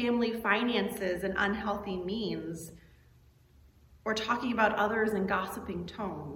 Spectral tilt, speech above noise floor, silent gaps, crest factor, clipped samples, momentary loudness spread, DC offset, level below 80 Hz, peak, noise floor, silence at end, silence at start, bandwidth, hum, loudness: -5 dB/octave; 29 dB; none; 20 dB; under 0.1%; 11 LU; under 0.1%; -58 dBFS; -12 dBFS; -61 dBFS; 0 s; 0 s; 16.5 kHz; none; -31 LUFS